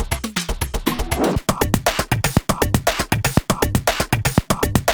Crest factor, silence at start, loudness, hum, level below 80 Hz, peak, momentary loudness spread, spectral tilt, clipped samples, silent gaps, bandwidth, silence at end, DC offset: 18 dB; 0 s; -20 LUFS; none; -30 dBFS; 0 dBFS; 5 LU; -4.5 dB/octave; under 0.1%; none; over 20 kHz; 0 s; 0.2%